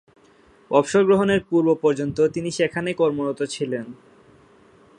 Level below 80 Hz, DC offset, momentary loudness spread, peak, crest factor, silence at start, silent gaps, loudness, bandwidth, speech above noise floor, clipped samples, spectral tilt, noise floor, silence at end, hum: -58 dBFS; under 0.1%; 9 LU; -4 dBFS; 20 dB; 0.7 s; none; -21 LUFS; 11 kHz; 34 dB; under 0.1%; -5.5 dB/octave; -54 dBFS; 1.05 s; none